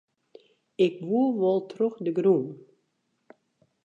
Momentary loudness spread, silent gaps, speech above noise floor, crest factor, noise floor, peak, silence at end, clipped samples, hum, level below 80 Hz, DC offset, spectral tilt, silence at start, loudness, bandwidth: 6 LU; none; 50 dB; 18 dB; -75 dBFS; -10 dBFS; 1.25 s; under 0.1%; none; -80 dBFS; under 0.1%; -8.5 dB/octave; 0.8 s; -25 LUFS; 7.2 kHz